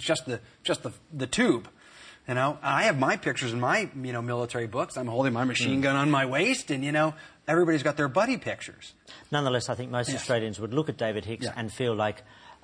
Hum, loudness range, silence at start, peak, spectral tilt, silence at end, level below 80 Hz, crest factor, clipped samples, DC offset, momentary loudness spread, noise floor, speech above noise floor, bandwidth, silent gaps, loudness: none; 4 LU; 0 s; -10 dBFS; -5 dB/octave; 0.1 s; -64 dBFS; 18 dB; under 0.1%; under 0.1%; 10 LU; -51 dBFS; 24 dB; 10.5 kHz; none; -27 LUFS